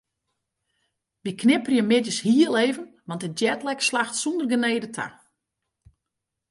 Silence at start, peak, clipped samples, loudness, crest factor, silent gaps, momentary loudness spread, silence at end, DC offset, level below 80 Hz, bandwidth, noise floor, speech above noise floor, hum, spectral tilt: 1.25 s; -6 dBFS; under 0.1%; -23 LUFS; 20 dB; none; 14 LU; 1.4 s; under 0.1%; -70 dBFS; 11.5 kHz; -83 dBFS; 61 dB; none; -4 dB/octave